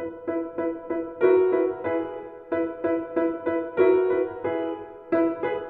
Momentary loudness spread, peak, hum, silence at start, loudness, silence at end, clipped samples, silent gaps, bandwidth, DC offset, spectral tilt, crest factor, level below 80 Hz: 11 LU; -8 dBFS; none; 0 s; -25 LUFS; 0 s; under 0.1%; none; 4.1 kHz; under 0.1%; -9.5 dB/octave; 18 dB; -64 dBFS